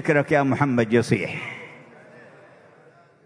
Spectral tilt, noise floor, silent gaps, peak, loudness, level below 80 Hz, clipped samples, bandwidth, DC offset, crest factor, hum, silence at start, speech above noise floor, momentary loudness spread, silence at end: -7 dB/octave; -53 dBFS; none; -4 dBFS; -22 LUFS; -62 dBFS; under 0.1%; 11 kHz; under 0.1%; 20 dB; none; 0 s; 32 dB; 16 LU; 1.05 s